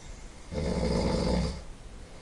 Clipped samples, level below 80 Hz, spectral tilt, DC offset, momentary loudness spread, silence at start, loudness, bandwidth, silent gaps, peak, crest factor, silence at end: under 0.1%; -38 dBFS; -6 dB/octave; under 0.1%; 20 LU; 0 s; -30 LUFS; 11.5 kHz; none; -16 dBFS; 16 dB; 0 s